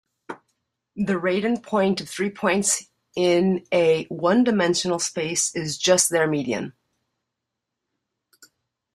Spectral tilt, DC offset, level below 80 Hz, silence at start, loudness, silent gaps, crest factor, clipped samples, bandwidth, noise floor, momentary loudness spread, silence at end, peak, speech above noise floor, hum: -3.5 dB/octave; under 0.1%; -64 dBFS; 0.3 s; -22 LUFS; none; 20 dB; under 0.1%; 15 kHz; -83 dBFS; 14 LU; 2.25 s; -4 dBFS; 61 dB; none